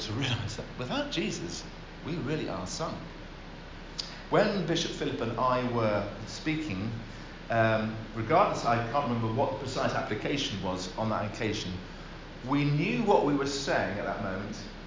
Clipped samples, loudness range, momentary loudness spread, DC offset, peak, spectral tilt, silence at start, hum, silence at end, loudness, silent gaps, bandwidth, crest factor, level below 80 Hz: under 0.1%; 5 LU; 15 LU; under 0.1%; -10 dBFS; -5.5 dB/octave; 0 s; none; 0 s; -30 LUFS; none; 7.6 kHz; 22 dB; -48 dBFS